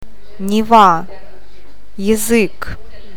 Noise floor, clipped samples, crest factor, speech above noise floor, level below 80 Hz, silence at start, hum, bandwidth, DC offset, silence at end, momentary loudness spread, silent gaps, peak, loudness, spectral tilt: -44 dBFS; 0.2%; 16 dB; 31 dB; -38 dBFS; 0.4 s; none; 19 kHz; 9%; 0.35 s; 20 LU; none; 0 dBFS; -13 LUFS; -4.5 dB/octave